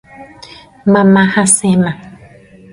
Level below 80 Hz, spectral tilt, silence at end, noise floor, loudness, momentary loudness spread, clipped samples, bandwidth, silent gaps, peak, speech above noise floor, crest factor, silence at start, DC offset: -48 dBFS; -5 dB/octave; 0.55 s; -40 dBFS; -11 LUFS; 10 LU; under 0.1%; 11.5 kHz; none; 0 dBFS; 30 dB; 14 dB; 0.2 s; under 0.1%